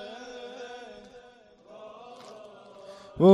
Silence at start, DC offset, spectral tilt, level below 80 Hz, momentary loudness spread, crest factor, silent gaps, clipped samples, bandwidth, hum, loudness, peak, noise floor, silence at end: 0.45 s; under 0.1%; -8 dB/octave; -66 dBFS; 10 LU; 22 dB; none; under 0.1%; 10 kHz; none; -34 LUFS; -6 dBFS; -55 dBFS; 0 s